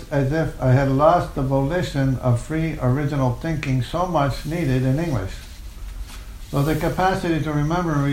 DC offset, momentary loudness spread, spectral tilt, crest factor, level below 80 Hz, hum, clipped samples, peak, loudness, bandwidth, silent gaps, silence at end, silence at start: under 0.1%; 19 LU; -7.5 dB/octave; 18 dB; -34 dBFS; none; under 0.1%; -4 dBFS; -21 LUFS; 16 kHz; none; 0 s; 0 s